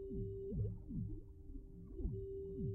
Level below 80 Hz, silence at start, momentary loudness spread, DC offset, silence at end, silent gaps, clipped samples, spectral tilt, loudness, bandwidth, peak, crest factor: -50 dBFS; 0 s; 12 LU; under 0.1%; 0 s; none; under 0.1%; -17 dB/octave; -47 LUFS; 1.2 kHz; -30 dBFS; 14 dB